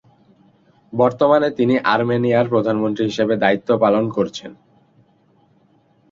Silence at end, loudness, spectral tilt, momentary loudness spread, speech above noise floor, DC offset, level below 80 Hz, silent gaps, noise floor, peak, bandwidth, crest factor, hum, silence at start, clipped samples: 1.6 s; -18 LUFS; -7 dB/octave; 7 LU; 40 dB; under 0.1%; -60 dBFS; none; -57 dBFS; -2 dBFS; 7.6 kHz; 18 dB; none; 0.9 s; under 0.1%